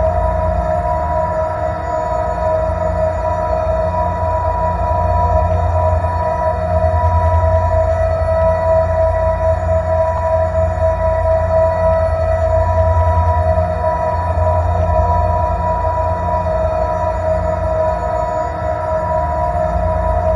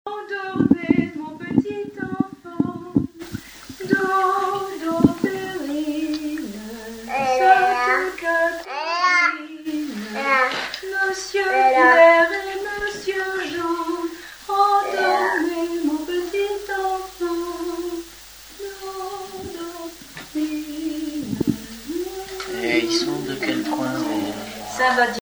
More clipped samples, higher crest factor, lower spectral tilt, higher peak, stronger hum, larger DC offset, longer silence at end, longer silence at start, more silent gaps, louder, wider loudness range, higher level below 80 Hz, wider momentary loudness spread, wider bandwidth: neither; second, 12 dB vs 22 dB; first, -8.5 dB/octave vs -4.5 dB/octave; about the same, -2 dBFS vs 0 dBFS; neither; neither; about the same, 0 s vs 0 s; about the same, 0 s vs 0.05 s; neither; first, -16 LUFS vs -21 LUFS; second, 3 LU vs 11 LU; first, -22 dBFS vs -52 dBFS; second, 4 LU vs 15 LU; second, 7.2 kHz vs over 20 kHz